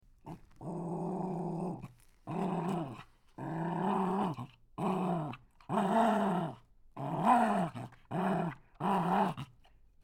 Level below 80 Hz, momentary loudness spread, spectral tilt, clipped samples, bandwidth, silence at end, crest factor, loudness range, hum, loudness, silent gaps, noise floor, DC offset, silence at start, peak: -64 dBFS; 19 LU; -7.5 dB/octave; under 0.1%; 15.5 kHz; 0.6 s; 20 dB; 6 LU; none; -34 LUFS; none; -61 dBFS; under 0.1%; 0.25 s; -14 dBFS